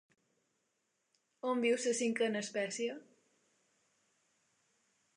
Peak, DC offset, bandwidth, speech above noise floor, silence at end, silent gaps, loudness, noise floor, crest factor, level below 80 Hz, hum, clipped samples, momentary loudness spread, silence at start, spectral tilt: -22 dBFS; under 0.1%; 11 kHz; 47 dB; 2.15 s; none; -35 LUFS; -82 dBFS; 18 dB; under -90 dBFS; none; under 0.1%; 9 LU; 1.45 s; -3 dB/octave